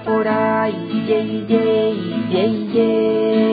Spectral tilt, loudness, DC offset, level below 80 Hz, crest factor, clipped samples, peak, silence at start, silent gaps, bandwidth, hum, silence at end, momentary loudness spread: -11 dB/octave; -18 LUFS; under 0.1%; -62 dBFS; 14 dB; under 0.1%; -4 dBFS; 0 s; none; 5 kHz; none; 0 s; 4 LU